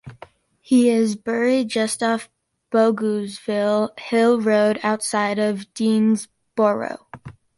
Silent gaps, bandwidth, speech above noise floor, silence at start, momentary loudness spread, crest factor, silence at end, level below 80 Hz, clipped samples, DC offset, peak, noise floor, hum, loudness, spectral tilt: none; 11.5 kHz; 27 dB; 0.05 s; 8 LU; 14 dB; 0.25 s; -64 dBFS; under 0.1%; under 0.1%; -6 dBFS; -47 dBFS; none; -20 LUFS; -5 dB/octave